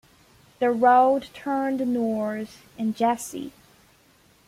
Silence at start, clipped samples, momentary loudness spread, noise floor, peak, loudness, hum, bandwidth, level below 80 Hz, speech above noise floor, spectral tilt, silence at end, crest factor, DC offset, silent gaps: 0.6 s; under 0.1%; 17 LU; -58 dBFS; -6 dBFS; -23 LUFS; none; 16 kHz; -66 dBFS; 35 dB; -5 dB/octave; 1 s; 18 dB; under 0.1%; none